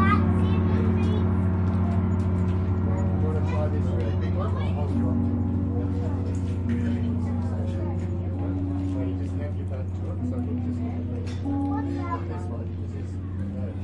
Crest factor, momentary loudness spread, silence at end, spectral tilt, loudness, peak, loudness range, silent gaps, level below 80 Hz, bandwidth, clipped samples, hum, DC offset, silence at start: 18 dB; 8 LU; 0 s; -9.5 dB/octave; -26 LUFS; -8 dBFS; 5 LU; none; -44 dBFS; 5.2 kHz; under 0.1%; none; under 0.1%; 0 s